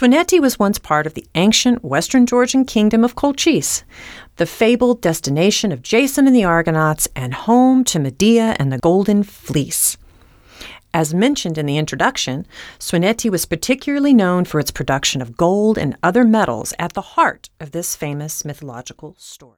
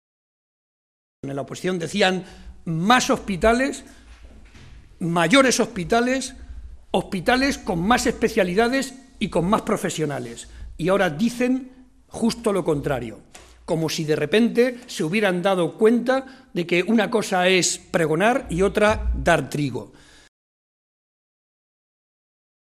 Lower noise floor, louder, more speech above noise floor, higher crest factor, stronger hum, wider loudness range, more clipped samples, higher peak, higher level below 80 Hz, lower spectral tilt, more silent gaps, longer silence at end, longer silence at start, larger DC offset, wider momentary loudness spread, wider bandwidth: about the same, -47 dBFS vs -45 dBFS; first, -16 LUFS vs -21 LUFS; first, 31 dB vs 24 dB; second, 16 dB vs 22 dB; neither; about the same, 4 LU vs 4 LU; neither; about the same, 0 dBFS vs -2 dBFS; about the same, -44 dBFS vs -42 dBFS; about the same, -4.5 dB/octave vs -4.5 dB/octave; neither; second, 0.2 s vs 2.85 s; second, 0 s vs 1.25 s; neither; about the same, 12 LU vs 13 LU; first, 17.5 kHz vs 14.5 kHz